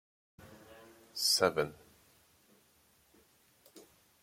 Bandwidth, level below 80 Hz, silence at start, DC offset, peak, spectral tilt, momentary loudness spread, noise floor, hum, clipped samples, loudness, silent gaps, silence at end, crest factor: 16.5 kHz; -74 dBFS; 0.45 s; under 0.1%; -12 dBFS; -2 dB/octave; 29 LU; -69 dBFS; none; under 0.1%; -31 LUFS; none; 0.4 s; 26 dB